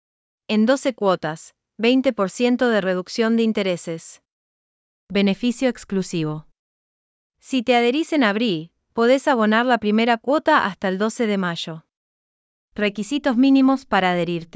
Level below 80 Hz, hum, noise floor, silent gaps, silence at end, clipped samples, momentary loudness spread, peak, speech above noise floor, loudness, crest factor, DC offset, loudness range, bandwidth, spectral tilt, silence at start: -60 dBFS; none; under -90 dBFS; 4.32-5.07 s, 6.59-7.30 s, 11.97-12.68 s; 0.1 s; under 0.1%; 11 LU; -4 dBFS; over 70 dB; -20 LUFS; 16 dB; under 0.1%; 6 LU; 8 kHz; -5.5 dB/octave; 0.5 s